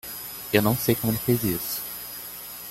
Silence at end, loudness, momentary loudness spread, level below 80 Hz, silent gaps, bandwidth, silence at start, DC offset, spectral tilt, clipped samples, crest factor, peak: 0 s; -26 LUFS; 12 LU; -52 dBFS; none; 17 kHz; 0.05 s; under 0.1%; -5 dB/octave; under 0.1%; 22 dB; -4 dBFS